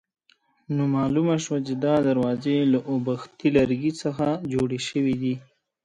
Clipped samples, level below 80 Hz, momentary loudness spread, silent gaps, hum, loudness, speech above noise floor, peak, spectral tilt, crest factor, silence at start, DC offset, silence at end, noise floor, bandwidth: under 0.1%; -56 dBFS; 6 LU; none; none; -24 LUFS; 41 dB; -6 dBFS; -6.5 dB/octave; 18 dB; 0.7 s; under 0.1%; 0.4 s; -64 dBFS; 10 kHz